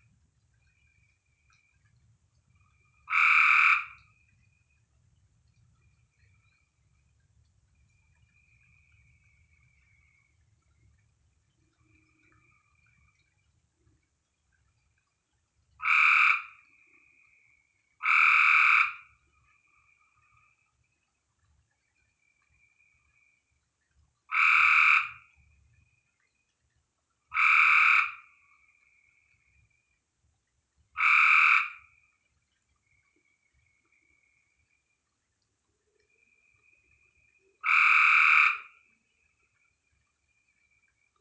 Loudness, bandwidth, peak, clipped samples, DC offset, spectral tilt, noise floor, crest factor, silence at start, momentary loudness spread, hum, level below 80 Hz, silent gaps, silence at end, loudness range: -21 LUFS; 8 kHz; -8 dBFS; under 0.1%; under 0.1%; 1.5 dB/octave; -79 dBFS; 24 dB; 3.1 s; 15 LU; none; -74 dBFS; none; 2.6 s; 6 LU